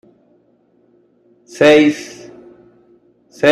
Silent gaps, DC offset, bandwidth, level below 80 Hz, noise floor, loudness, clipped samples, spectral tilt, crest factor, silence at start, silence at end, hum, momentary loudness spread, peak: none; under 0.1%; 12 kHz; -60 dBFS; -56 dBFS; -12 LUFS; under 0.1%; -5 dB/octave; 16 dB; 1.55 s; 0 s; none; 27 LU; 0 dBFS